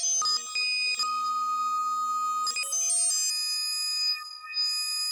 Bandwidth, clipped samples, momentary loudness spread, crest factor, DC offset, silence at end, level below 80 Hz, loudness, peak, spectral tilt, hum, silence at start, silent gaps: over 20 kHz; under 0.1%; 5 LU; 14 dB; under 0.1%; 0 s; -84 dBFS; -26 LUFS; -16 dBFS; 5.5 dB/octave; none; 0 s; none